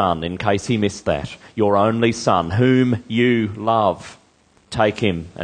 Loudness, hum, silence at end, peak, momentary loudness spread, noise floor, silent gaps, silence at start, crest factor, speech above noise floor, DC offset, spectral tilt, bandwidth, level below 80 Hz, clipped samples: -19 LUFS; none; 0 s; -2 dBFS; 7 LU; -56 dBFS; none; 0 s; 18 dB; 37 dB; under 0.1%; -6 dB/octave; 9.8 kHz; -46 dBFS; under 0.1%